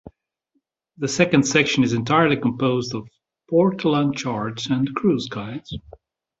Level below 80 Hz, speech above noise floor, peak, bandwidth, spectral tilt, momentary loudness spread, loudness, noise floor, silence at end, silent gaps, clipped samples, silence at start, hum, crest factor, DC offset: -54 dBFS; 52 dB; -2 dBFS; 8 kHz; -5 dB/octave; 14 LU; -20 LUFS; -72 dBFS; 0.6 s; none; under 0.1%; 0.05 s; none; 20 dB; under 0.1%